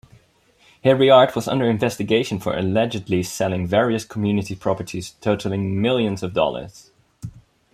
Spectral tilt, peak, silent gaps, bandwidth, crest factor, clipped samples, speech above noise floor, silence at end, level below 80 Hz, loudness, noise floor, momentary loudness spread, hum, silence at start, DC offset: -6 dB/octave; -2 dBFS; none; 15.5 kHz; 18 dB; under 0.1%; 38 dB; 0.35 s; -54 dBFS; -20 LUFS; -57 dBFS; 14 LU; none; 0.85 s; under 0.1%